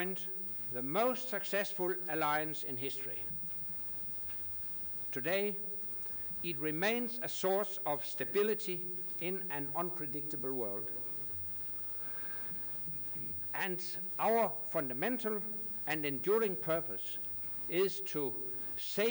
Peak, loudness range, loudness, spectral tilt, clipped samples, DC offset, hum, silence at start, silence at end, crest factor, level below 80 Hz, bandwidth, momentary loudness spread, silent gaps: -20 dBFS; 2 LU; -33 LUFS; -4.5 dB/octave; under 0.1%; under 0.1%; none; 0 s; 0 s; 16 dB; -70 dBFS; over 20 kHz; 3 LU; none